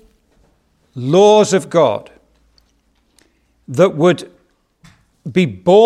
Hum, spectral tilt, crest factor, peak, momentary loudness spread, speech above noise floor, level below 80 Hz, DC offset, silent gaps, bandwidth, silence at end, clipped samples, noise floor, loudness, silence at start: none; -6 dB/octave; 16 dB; 0 dBFS; 16 LU; 47 dB; -60 dBFS; under 0.1%; none; 12 kHz; 0 s; under 0.1%; -59 dBFS; -14 LUFS; 0.95 s